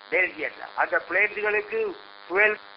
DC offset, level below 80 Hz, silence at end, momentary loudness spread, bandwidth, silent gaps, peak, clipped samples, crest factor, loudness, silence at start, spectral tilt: under 0.1%; -66 dBFS; 0 s; 11 LU; 5.6 kHz; none; -8 dBFS; under 0.1%; 18 dB; -24 LUFS; 0 s; -7 dB/octave